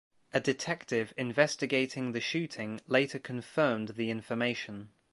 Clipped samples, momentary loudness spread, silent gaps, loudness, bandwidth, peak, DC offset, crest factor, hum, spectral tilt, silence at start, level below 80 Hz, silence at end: under 0.1%; 9 LU; none; -32 LUFS; 11.5 kHz; -8 dBFS; under 0.1%; 24 dB; none; -4.5 dB/octave; 0.35 s; -72 dBFS; 0.25 s